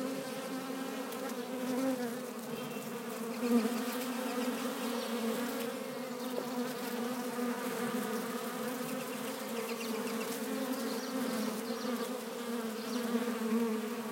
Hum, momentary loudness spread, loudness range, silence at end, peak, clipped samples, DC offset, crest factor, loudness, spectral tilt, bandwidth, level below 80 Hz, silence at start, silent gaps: none; 6 LU; 2 LU; 0 s; -18 dBFS; under 0.1%; under 0.1%; 18 dB; -37 LUFS; -4 dB/octave; 17 kHz; -88 dBFS; 0 s; none